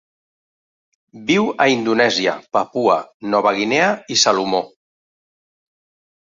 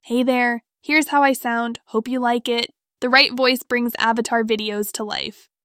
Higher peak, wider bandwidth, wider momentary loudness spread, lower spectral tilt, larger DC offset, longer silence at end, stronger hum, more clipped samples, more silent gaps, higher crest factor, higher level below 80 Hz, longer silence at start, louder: about the same, -2 dBFS vs -2 dBFS; second, 7.6 kHz vs 19.5 kHz; second, 6 LU vs 11 LU; about the same, -3 dB/octave vs -2.5 dB/octave; neither; first, 1.55 s vs 0.35 s; neither; neither; first, 3.14-3.20 s vs none; about the same, 18 dB vs 20 dB; about the same, -64 dBFS vs -66 dBFS; first, 1.15 s vs 0.05 s; first, -17 LUFS vs -20 LUFS